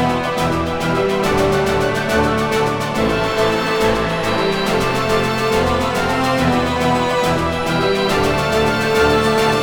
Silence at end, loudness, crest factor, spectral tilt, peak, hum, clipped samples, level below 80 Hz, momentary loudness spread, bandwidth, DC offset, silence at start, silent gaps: 0 s; -17 LUFS; 14 dB; -5 dB/octave; -2 dBFS; none; under 0.1%; -34 dBFS; 3 LU; 19.5 kHz; under 0.1%; 0 s; none